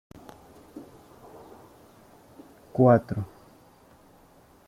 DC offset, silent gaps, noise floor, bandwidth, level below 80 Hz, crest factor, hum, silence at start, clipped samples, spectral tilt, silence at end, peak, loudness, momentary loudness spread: under 0.1%; none; -56 dBFS; 15.5 kHz; -60 dBFS; 24 dB; none; 0.75 s; under 0.1%; -9.5 dB/octave; 1.4 s; -6 dBFS; -23 LUFS; 29 LU